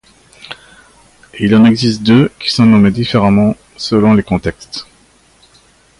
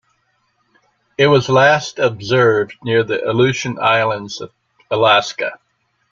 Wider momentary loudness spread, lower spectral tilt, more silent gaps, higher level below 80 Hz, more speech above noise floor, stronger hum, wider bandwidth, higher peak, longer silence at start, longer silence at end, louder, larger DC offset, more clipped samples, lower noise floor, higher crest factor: first, 18 LU vs 13 LU; first, -6.5 dB/octave vs -5 dB/octave; neither; first, -40 dBFS vs -56 dBFS; second, 38 dB vs 49 dB; neither; first, 11.5 kHz vs 7.6 kHz; about the same, 0 dBFS vs 0 dBFS; second, 0.5 s vs 1.2 s; first, 1.15 s vs 0.55 s; first, -11 LUFS vs -15 LUFS; neither; neither; second, -49 dBFS vs -64 dBFS; about the same, 12 dB vs 16 dB